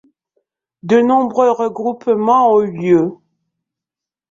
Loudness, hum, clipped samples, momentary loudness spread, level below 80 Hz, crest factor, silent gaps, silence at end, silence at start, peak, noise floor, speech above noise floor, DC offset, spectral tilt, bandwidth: -14 LUFS; none; under 0.1%; 8 LU; -60 dBFS; 14 dB; none; 1.2 s; 0.85 s; -2 dBFS; -87 dBFS; 73 dB; under 0.1%; -7.5 dB/octave; 7.4 kHz